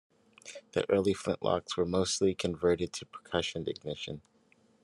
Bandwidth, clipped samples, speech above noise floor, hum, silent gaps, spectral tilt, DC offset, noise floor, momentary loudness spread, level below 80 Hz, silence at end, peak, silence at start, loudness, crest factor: 12 kHz; under 0.1%; 35 dB; none; none; -4.5 dB/octave; under 0.1%; -67 dBFS; 14 LU; -66 dBFS; 0.65 s; -12 dBFS; 0.45 s; -32 LUFS; 20 dB